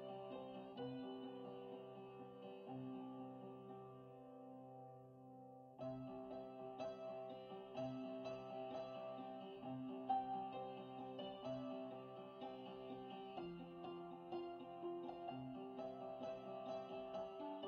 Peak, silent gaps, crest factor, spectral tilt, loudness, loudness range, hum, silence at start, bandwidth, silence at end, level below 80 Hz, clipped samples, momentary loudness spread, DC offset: -30 dBFS; none; 20 dB; -5.5 dB/octave; -52 LUFS; 7 LU; none; 0 s; 6.4 kHz; 0 s; -84 dBFS; under 0.1%; 8 LU; under 0.1%